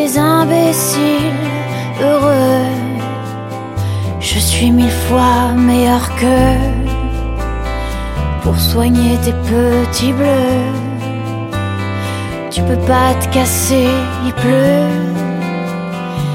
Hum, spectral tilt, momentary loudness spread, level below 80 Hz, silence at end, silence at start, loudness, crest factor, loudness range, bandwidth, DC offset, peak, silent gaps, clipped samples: none; -5.5 dB/octave; 10 LU; -24 dBFS; 0 s; 0 s; -14 LUFS; 14 dB; 3 LU; 17 kHz; under 0.1%; 0 dBFS; none; under 0.1%